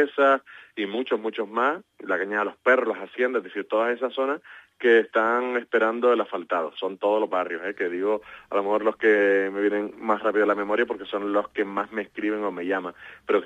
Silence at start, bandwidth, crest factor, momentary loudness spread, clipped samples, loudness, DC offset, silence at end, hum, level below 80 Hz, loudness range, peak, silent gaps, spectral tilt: 0 s; 7.8 kHz; 18 dB; 9 LU; under 0.1%; -25 LUFS; under 0.1%; 0 s; none; -72 dBFS; 2 LU; -6 dBFS; none; -6 dB/octave